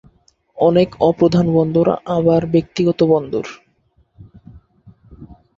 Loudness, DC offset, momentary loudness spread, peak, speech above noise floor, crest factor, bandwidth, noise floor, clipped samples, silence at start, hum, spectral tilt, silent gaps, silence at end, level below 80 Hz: -16 LUFS; under 0.1%; 5 LU; -2 dBFS; 44 dB; 16 dB; 7.4 kHz; -59 dBFS; under 0.1%; 0.55 s; none; -8 dB/octave; none; 0.25 s; -48 dBFS